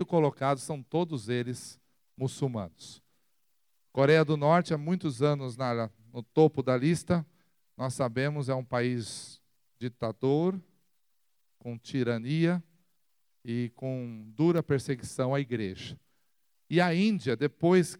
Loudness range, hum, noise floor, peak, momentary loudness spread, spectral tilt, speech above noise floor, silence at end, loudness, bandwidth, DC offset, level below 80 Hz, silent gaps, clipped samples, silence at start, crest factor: 6 LU; none; -79 dBFS; -10 dBFS; 17 LU; -6.5 dB/octave; 51 dB; 0.05 s; -29 LUFS; 14 kHz; under 0.1%; -70 dBFS; none; under 0.1%; 0 s; 20 dB